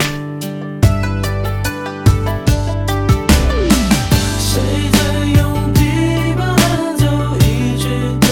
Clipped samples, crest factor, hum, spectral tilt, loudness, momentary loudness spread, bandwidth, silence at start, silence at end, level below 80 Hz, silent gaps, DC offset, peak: under 0.1%; 14 dB; none; -5.5 dB/octave; -15 LUFS; 6 LU; 18.5 kHz; 0 s; 0 s; -22 dBFS; none; under 0.1%; 0 dBFS